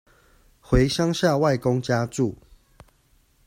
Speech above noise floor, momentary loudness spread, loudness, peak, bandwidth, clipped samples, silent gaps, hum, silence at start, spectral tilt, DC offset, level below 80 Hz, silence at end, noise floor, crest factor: 40 dB; 6 LU; -23 LUFS; -6 dBFS; 16 kHz; under 0.1%; none; none; 0.7 s; -6 dB/octave; under 0.1%; -38 dBFS; 1.1 s; -61 dBFS; 18 dB